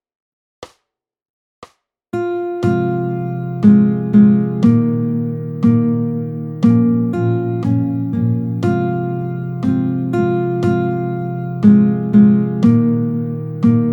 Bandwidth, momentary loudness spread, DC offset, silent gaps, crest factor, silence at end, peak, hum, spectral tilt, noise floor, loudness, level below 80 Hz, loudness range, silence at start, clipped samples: 6.2 kHz; 11 LU; under 0.1%; 1.22-1.62 s; 16 dB; 0 s; 0 dBFS; none; -10.5 dB/octave; -75 dBFS; -15 LUFS; -54 dBFS; 4 LU; 0.6 s; under 0.1%